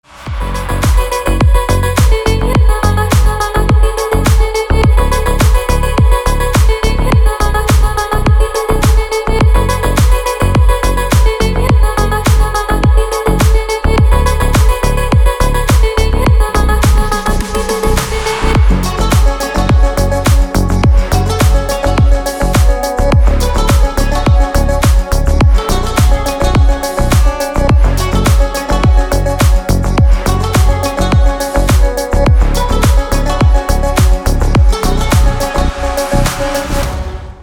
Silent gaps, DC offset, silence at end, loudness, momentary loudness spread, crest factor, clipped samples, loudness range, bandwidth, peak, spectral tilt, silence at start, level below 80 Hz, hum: none; under 0.1%; 0 s; -12 LUFS; 3 LU; 10 dB; under 0.1%; 1 LU; 17 kHz; 0 dBFS; -5.5 dB/octave; 0.15 s; -12 dBFS; none